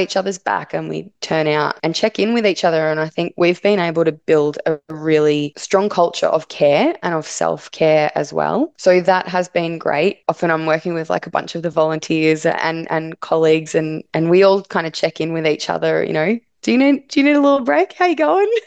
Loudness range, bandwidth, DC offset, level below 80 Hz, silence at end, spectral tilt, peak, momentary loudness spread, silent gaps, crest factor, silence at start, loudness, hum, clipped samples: 2 LU; 9 kHz; under 0.1%; -64 dBFS; 0.05 s; -5.5 dB/octave; -2 dBFS; 7 LU; none; 16 dB; 0 s; -17 LUFS; none; under 0.1%